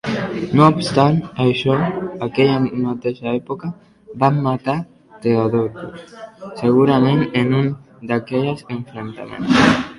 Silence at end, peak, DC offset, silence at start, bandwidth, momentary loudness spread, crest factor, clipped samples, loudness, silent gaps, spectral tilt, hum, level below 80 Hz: 0 s; 0 dBFS; under 0.1%; 0.05 s; 11.5 kHz; 17 LU; 18 dB; under 0.1%; -18 LUFS; none; -7 dB/octave; none; -50 dBFS